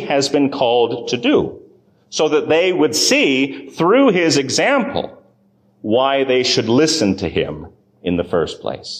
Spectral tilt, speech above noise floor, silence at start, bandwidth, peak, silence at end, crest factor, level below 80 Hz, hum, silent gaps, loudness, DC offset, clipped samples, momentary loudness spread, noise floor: -4 dB/octave; 40 dB; 0 s; 15.5 kHz; -4 dBFS; 0 s; 14 dB; -48 dBFS; none; none; -16 LUFS; under 0.1%; under 0.1%; 12 LU; -56 dBFS